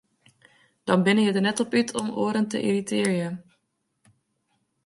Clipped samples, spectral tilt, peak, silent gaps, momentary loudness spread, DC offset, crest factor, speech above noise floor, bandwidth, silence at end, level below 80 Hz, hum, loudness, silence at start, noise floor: under 0.1%; -5 dB/octave; -6 dBFS; none; 9 LU; under 0.1%; 20 dB; 52 dB; 11.5 kHz; 1.45 s; -70 dBFS; none; -24 LUFS; 0.85 s; -75 dBFS